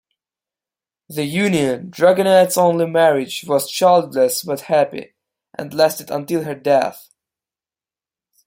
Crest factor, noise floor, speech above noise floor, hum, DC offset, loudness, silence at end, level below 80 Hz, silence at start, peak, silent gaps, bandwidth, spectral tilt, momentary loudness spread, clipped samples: 16 dB; under -90 dBFS; over 73 dB; none; under 0.1%; -17 LUFS; 1.45 s; -64 dBFS; 1.1 s; -2 dBFS; none; 16.5 kHz; -4.5 dB/octave; 12 LU; under 0.1%